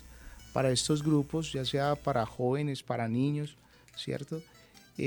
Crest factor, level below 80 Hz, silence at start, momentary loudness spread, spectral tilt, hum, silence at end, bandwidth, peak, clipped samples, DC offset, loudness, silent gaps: 18 dB; -56 dBFS; 0 s; 14 LU; -5.5 dB/octave; none; 0 s; over 20 kHz; -14 dBFS; under 0.1%; under 0.1%; -31 LUFS; none